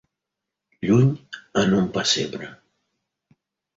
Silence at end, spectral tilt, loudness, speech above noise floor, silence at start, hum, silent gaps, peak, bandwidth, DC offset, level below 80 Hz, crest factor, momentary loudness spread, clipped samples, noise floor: 1.2 s; -5 dB/octave; -21 LUFS; 63 dB; 0.8 s; none; none; -6 dBFS; 8 kHz; under 0.1%; -54 dBFS; 18 dB; 16 LU; under 0.1%; -84 dBFS